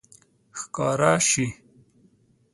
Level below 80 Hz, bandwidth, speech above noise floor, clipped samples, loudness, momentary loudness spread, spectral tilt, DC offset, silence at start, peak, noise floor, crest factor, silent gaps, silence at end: -60 dBFS; 11.5 kHz; 38 dB; under 0.1%; -22 LUFS; 17 LU; -3.5 dB/octave; under 0.1%; 0.55 s; -4 dBFS; -61 dBFS; 22 dB; none; 1 s